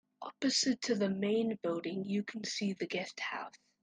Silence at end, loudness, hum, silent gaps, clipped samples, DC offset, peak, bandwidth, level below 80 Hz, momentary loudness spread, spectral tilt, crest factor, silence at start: 0.25 s; -35 LUFS; none; none; under 0.1%; under 0.1%; -20 dBFS; 9.8 kHz; -80 dBFS; 9 LU; -4 dB/octave; 16 dB; 0.2 s